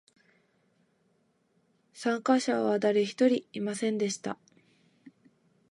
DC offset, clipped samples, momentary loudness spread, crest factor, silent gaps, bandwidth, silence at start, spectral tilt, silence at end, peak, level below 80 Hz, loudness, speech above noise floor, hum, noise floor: under 0.1%; under 0.1%; 10 LU; 20 dB; none; 11.5 kHz; 1.95 s; -4.5 dB/octave; 0.6 s; -12 dBFS; -82 dBFS; -29 LUFS; 44 dB; none; -71 dBFS